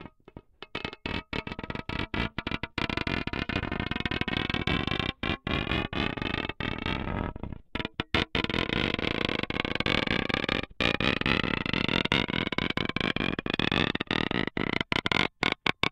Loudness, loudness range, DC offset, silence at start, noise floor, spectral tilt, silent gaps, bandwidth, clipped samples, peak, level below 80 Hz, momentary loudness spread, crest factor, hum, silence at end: -29 LUFS; 5 LU; under 0.1%; 0 s; -52 dBFS; -5.5 dB/octave; none; 16 kHz; under 0.1%; -4 dBFS; -44 dBFS; 9 LU; 26 dB; none; 0 s